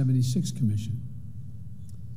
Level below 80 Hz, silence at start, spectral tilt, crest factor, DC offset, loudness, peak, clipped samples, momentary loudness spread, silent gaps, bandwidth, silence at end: -54 dBFS; 0 s; -7 dB/octave; 14 dB; 1%; -28 LUFS; -14 dBFS; under 0.1%; 18 LU; none; 15.5 kHz; 0 s